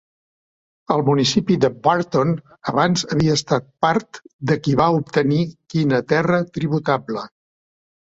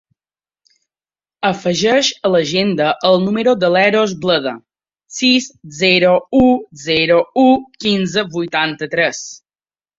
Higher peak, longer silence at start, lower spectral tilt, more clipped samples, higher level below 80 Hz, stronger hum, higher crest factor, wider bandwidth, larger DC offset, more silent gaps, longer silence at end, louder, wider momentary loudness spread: about the same, -2 dBFS vs -2 dBFS; second, 0.9 s vs 1.4 s; first, -6 dB/octave vs -4.5 dB/octave; neither; about the same, -52 dBFS vs -50 dBFS; neither; about the same, 18 dB vs 14 dB; about the same, 8 kHz vs 7.8 kHz; neither; first, 4.33-4.39 s vs none; first, 0.8 s vs 0.6 s; second, -19 LUFS vs -14 LUFS; about the same, 7 LU vs 7 LU